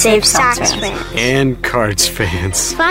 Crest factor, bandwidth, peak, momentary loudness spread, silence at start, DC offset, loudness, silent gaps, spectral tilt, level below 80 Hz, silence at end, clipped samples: 14 dB; 16.5 kHz; 0 dBFS; 7 LU; 0 s; under 0.1%; -13 LUFS; none; -3 dB/octave; -30 dBFS; 0 s; under 0.1%